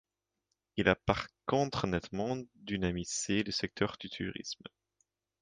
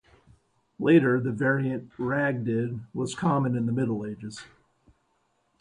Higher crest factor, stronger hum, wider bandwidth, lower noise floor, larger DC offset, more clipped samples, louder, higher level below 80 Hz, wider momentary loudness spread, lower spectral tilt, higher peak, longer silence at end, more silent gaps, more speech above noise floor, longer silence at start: first, 26 dB vs 20 dB; neither; about the same, 10 kHz vs 11 kHz; first, -85 dBFS vs -71 dBFS; neither; neither; second, -34 LUFS vs -26 LUFS; first, -54 dBFS vs -62 dBFS; about the same, 11 LU vs 13 LU; second, -4.5 dB/octave vs -7.5 dB/octave; about the same, -10 dBFS vs -8 dBFS; second, 0.85 s vs 1.15 s; neither; first, 51 dB vs 46 dB; about the same, 0.75 s vs 0.8 s